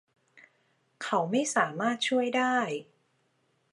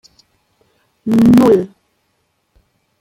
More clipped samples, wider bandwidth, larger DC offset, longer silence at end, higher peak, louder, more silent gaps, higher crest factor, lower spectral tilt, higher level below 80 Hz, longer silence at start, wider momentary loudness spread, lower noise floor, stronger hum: neither; second, 11.5 kHz vs 16 kHz; neither; second, 0.9 s vs 1.35 s; second, -10 dBFS vs 0 dBFS; second, -28 LUFS vs -11 LUFS; neither; about the same, 20 dB vs 16 dB; second, -3.5 dB/octave vs -8 dB/octave; second, -86 dBFS vs -48 dBFS; about the same, 1 s vs 1.05 s; second, 8 LU vs 20 LU; first, -72 dBFS vs -65 dBFS; neither